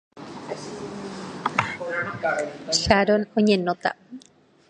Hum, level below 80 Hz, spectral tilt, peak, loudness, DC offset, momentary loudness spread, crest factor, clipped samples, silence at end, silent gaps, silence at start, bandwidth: none; -48 dBFS; -4 dB/octave; 0 dBFS; -24 LUFS; under 0.1%; 19 LU; 24 dB; under 0.1%; 0.5 s; none; 0.15 s; 10.5 kHz